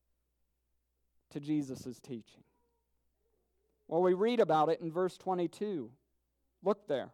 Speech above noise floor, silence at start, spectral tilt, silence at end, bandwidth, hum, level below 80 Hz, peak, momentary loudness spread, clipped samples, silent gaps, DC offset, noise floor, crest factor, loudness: 47 dB; 1.35 s; -7 dB/octave; 0.05 s; 13 kHz; none; -80 dBFS; -16 dBFS; 18 LU; under 0.1%; none; under 0.1%; -80 dBFS; 20 dB; -33 LUFS